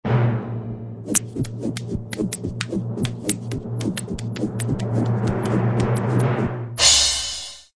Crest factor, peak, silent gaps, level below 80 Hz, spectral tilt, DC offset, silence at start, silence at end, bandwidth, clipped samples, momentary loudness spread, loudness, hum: 22 dB; 0 dBFS; none; -42 dBFS; -4 dB/octave; under 0.1%; 0.05 s; 0.15 s; 11 kHz; under 0.1%; 13 LU; -22 LUFS; none